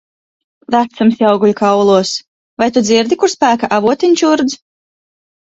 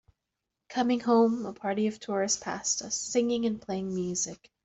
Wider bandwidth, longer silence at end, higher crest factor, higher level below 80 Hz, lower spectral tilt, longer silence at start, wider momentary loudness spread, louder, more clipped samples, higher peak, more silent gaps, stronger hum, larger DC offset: about the same, 8 kHz vs 8.2 kHz; first, 0.85 s vs 0.3 s; about the same, 14 dB vs 16 dB; first, -56 dBFS vs -66 dBFS; about the same, -4.5 dB/octave vs -3.5 dB/octave; about the same, 0.7 s vs 0.7 s; about the same, 7 LU vs 9 LU; first, -12 LUFS vs -29 LUFS; neither; first, 0 dBFS vs -14 dBFS; first, 2.28-2.57 s vs none; neither; neither